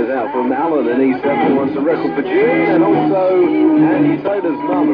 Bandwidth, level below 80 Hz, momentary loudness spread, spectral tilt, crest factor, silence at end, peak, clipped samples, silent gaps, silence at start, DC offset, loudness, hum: 5.2 kHz; -54 dBFS; 5 LU; -10 dB/octave; 10 dB; 0 s; -2 dBFS; under 0.1%; none; 0 s; under 0.1%; -14 LUFS; none